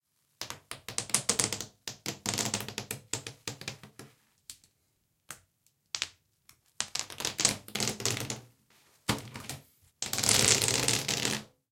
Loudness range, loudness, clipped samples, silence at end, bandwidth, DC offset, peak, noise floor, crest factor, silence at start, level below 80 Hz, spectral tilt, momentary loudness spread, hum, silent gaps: 14 LU; -30 LUFS; under 0.1%; 0.25 s; 17 kHz; under 0.1%; -4 dBFS; -75 dBFS; 30 dB; 0.4 s; -62 dBFS; -1.5 dB/octave; 21 LU; none; none